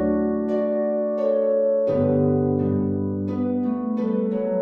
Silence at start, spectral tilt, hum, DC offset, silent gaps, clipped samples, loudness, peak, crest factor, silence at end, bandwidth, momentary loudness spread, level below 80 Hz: 0 s; -11.5 dB/octave; none; under 0.1%; none; under 0.1%; -22 LUFS; -10 dBFS; 12 dB; 0 s; 4.4 kHz; 4 LU; -54 dBFS